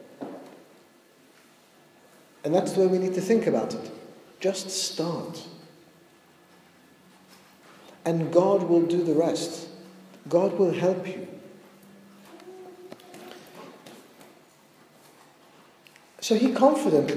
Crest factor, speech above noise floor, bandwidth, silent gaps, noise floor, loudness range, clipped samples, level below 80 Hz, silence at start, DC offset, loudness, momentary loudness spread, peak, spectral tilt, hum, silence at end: 22 dB; 33 dB; 15.5 kHz; none; -57 dBFS; 22 LU; under 0.1%; -82 dBFS; 0 s; under 0.1%; -25 LUFS; 25 LU; -6 dBFS; -5.5 dB/octave; none; 0 s